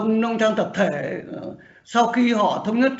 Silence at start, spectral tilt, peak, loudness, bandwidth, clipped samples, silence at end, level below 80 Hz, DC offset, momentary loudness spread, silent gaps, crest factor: 0 s; -4 dB/octave; -6 dBFS; -21 LUFS; 8 kHz; under 0.1%; 0 s; -64 dBFS; under 0.1%; 14 LU; none; 16 dB